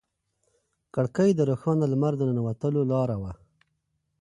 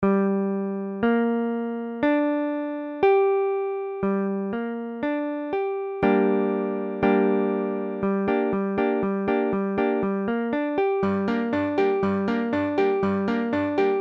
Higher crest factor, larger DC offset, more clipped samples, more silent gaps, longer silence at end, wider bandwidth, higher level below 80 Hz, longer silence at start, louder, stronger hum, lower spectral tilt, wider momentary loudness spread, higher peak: about the same, 16 dB vs 14 dB; neither; neither; neither; first, 0.85 s vs 0 s; first, 10.5 kHz vs 5.8 kHz; about the same, -56 dBFS vs -58 dBFS; first, 0.95 s vs 0 s; about the same, -26 LUFS vs -24 LUFS; neither; about the same, -9 dB/octave vs -9 dB/octave; about the same, 9 LU vs 7 LU; about the same, -10 dBFS vs -8 dBFS